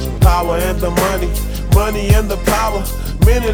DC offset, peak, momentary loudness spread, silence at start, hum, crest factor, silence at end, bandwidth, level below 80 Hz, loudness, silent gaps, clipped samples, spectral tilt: under 0.1%; 0 dBFS; 7 LU; 0 s; none; 14 dB; 0 s; 18.5 kHz; -18 dBFS; -16 LUFS; none; 0.1%; -5.5 dB/octave